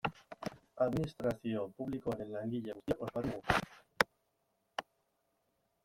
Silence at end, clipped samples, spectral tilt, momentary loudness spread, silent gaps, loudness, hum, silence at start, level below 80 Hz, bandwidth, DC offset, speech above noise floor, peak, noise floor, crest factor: 1.05 s; under 0.1%; -5.5 dB/octave; 12 LU; none; -38 LUFS; none; 0.05 s; -60 dBFS; 16.5 kHz; under 0.1%; 43 dB; -8 dBFS; -80 dBFS; 30 dB